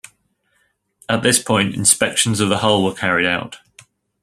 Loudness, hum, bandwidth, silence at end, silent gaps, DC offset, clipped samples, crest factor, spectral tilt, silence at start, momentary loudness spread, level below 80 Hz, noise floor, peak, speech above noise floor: -16 LUFS; none; 16 kHz; 0.65 s; none; under 0.1%; under 0.1%; 20 dB; -3 dB/octave; 1.1 s; 7 LU; -54 dBFS; -65 dBFS; 0 dBFS; 48 dB